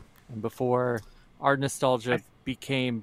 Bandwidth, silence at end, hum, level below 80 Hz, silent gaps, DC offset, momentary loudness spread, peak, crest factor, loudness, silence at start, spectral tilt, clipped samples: 15.5 kHz; 0 s; none; -60 dBFS; none; under 0.1%; 11 LU; -8 dBFS; 22 dB; -28 LUFS; 0 s; -5.5 dB/octave; under 0.1%